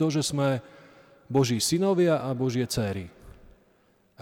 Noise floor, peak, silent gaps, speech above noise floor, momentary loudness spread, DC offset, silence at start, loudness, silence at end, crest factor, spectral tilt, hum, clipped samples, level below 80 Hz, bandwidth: -64 dBFS; -12 dBFS; none; 39 dB; 10 LU; under 0.1%; 0 s; -26 LUFS; 0.9 s; 16 dB; -5 dB/octave; none; under 0.1%; -56 dBFS; 18.5 kHz